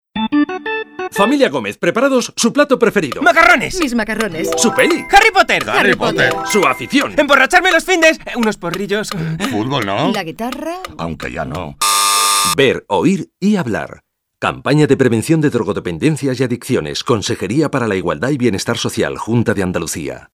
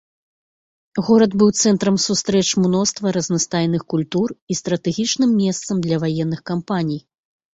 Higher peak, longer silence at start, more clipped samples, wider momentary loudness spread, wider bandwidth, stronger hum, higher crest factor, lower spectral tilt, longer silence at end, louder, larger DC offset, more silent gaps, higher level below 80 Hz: about the same, 0 dBFS vs -2 dBFS; second, 0.15 s vs 0.95 s; neither; first, 12 LU vs 8 LU; first, over 20 kHz vs 8 kHz; neither; about the same, 14 dB vs 18 dB; about the same, -4 dB/octave vs -5 dB/octave; second, 0.1 s vs 0.55 s; first, -14 LUFS vs -19 LUFS; neither; second, none vs 4.42-4.47 s; first, -42 dBFS vs -56 dBFS